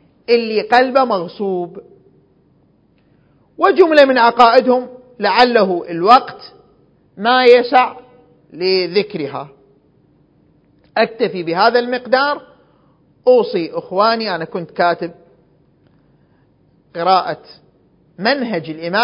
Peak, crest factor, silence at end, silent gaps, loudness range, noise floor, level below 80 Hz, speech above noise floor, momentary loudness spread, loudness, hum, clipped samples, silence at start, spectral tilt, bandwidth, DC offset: 0 dBFS; 16 dB; 0 s; none; 8 LU; -55 dBFS; -62 dBFS; 41 dB; 15 LU; -14 LUFS; none; 0.1%; 0.3 s; -6 dB/octave; 8 kHz; under 0.1%